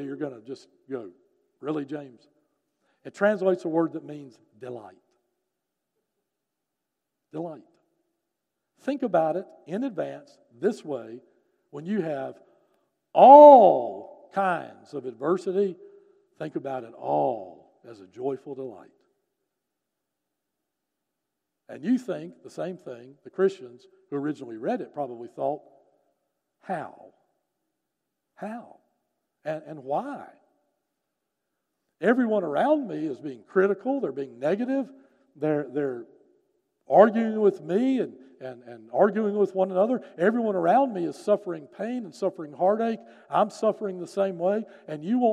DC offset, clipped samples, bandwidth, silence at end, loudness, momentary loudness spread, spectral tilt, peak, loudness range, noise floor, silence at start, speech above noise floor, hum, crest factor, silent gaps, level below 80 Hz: under 0.1%; under 0.1%; 9.6 kHz; 0 s; -24 LUFS; 18 LU; -7.5 dB/octave; -2 dBFS; 22 LU; -84 dBFS; 0 s; 60 dB; none; 24 dB; none; -86 dBFS